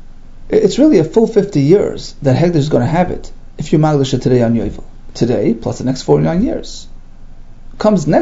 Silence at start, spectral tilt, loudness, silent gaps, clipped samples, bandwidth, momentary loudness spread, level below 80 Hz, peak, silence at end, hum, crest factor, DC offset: 0 s; -7.5 dB/octave; -13 LUFS; none; under 0.1%; 8 kHz; 11 LU; -32 dBFS; 0 dBFS; 0 s; none; 14 dB; under 0.1%